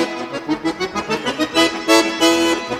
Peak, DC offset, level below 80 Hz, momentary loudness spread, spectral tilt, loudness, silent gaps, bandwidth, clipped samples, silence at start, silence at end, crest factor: 0 dBFS; under 0.1%; -52 dBFS; 9 LU; -2.5 dB/octave; -17 LUFS; none; 15.5 kHz; under 0.1%; 0 s; 0 s; 18 dB